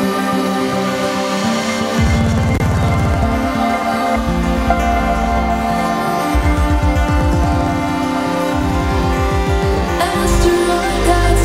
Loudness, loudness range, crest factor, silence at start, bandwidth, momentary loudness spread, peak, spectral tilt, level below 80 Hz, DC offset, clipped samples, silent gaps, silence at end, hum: -16 LUFS; 1 LU; 14 dB; 0 s; 16 kHz; 3 LU; 0 dBFS; -6 dB/octave; -20 dBFS; under 0.1%; under 0.1%; none; 0 s; none